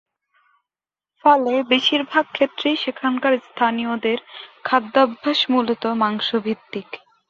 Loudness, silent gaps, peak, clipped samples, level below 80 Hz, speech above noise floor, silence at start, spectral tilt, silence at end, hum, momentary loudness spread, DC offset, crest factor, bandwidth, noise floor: -20 LUFS; none; -2 dBFS; under 0.1%; -68 dBFS; over 70 dB; 1.25 s; -4.5 dB/octave; 0.35 s; none; 10 LU; under 0.1%; 18 dB; 7.4 kHz; under -90 dBFS